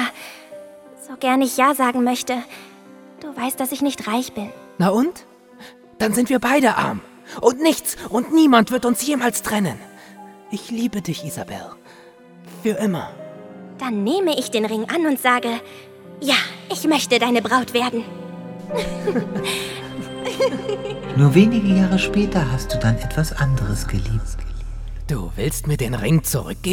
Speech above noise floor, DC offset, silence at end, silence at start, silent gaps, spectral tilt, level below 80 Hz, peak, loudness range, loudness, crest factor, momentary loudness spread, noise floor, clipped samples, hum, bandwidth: 26 dB; under 0.1%; 0 s; 0 s; none; -5 dB/octave; -36 dBFS; 0 dBFS; 7 LU; -20 LUFS; 20 dB; 18 LU; -45 dBFS; under 0.1%; none; 19 kHz